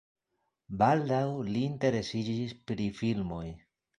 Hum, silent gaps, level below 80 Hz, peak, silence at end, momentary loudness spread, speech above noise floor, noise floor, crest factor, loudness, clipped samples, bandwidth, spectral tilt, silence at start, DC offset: none; none; -58 dBFS; -12 dBFS; 0.4 s; 11 LU; 51 dB; -81 dBFS; 20 dB; -31 LUFS; under 0.1%; 11 kHz; -7 dB/octave; 0.7 s; under 0.1%